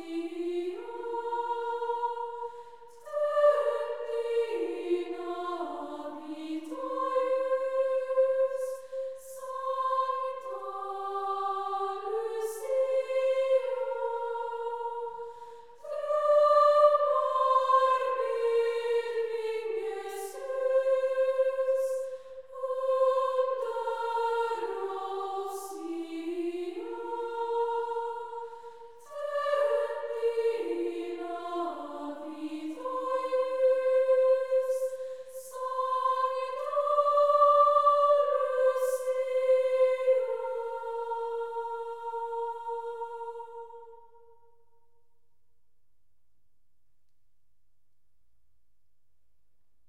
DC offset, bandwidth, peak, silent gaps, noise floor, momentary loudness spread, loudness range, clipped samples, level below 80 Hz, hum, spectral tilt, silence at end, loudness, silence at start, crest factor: 0.2%; 14 kHz; -12 dBFS; none; -81 dBFS; 14 LU; 10 LU; under 0.1%; -80 dBFS; none; -3 dB/octave; 5.9 s; -29 LUFS; 0 s; 18 dB